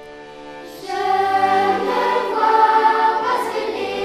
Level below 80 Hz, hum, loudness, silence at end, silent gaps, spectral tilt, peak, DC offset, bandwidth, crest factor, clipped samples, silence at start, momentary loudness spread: -58 dBFS; none; -17 LUFS; 0 s; none; -4 dB/octave; -4 dBFS; under 0.1%; 14.5 kHz; 16 dB; under 0.1%; 0 s; 21 LU